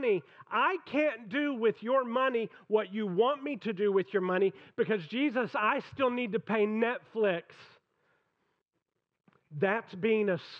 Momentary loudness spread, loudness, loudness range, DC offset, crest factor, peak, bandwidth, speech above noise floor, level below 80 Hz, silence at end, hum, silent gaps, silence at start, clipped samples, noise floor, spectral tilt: 5 LU; -31 LUFS; 5 LU; under 0.1%; 16 dB; -16 dBFS; 6.2 kHz; 54 dB; -82 dBFS; 0 s; none; none; 0 s; under 0.1%; -84 dBFS; -7.5 dB/octave